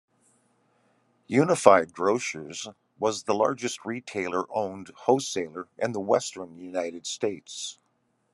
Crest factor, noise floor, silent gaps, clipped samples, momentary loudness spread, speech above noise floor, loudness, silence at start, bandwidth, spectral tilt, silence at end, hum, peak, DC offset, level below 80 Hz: 26 dB; -72 dBFS; none; under 0.1%; 16 LU; 45 dB; -27 LUFS; 1.3 s; 12.5 kHz; -4 dB/octave; 0.6 s; none; 0 dBFS; under 0.1%; -74 dBFS